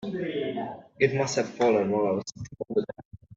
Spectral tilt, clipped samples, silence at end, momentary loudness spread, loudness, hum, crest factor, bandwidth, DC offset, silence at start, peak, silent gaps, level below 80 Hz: -5.5 dB/octave; under 0.1%; 0 s; 15 LU; -27 LUFS; none; 20 dB; 7.8 kHz; under 0.1%; 0 s; -8 dBFS; 3.05-3.11 s; -64 dBFS